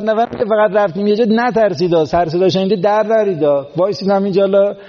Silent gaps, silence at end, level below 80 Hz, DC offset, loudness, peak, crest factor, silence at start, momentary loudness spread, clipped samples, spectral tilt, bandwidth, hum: none; 0 s; -50 dBFS; under 0.1%; -14 LUFS; -2 dBFS; 10 dB; 0 s; 3 LU; under 0.1%; -5 dB/octave; 7 kHz; none